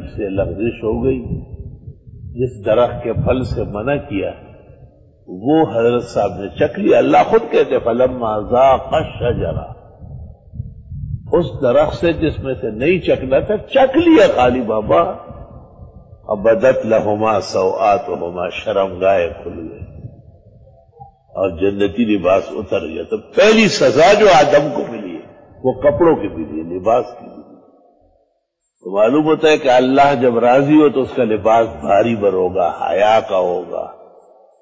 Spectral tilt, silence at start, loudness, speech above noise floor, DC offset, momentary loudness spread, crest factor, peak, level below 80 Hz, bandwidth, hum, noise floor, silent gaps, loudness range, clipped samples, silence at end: -6 dB/octave; 0 s; -15 LUFS; 53 dB; under 0.1%; 18 LU; 14 dB; -2 dBFS; -38 dBFS; 8 kHz; none; -68 dBFS; none; 7 LU; under 0.1%; 0.65 s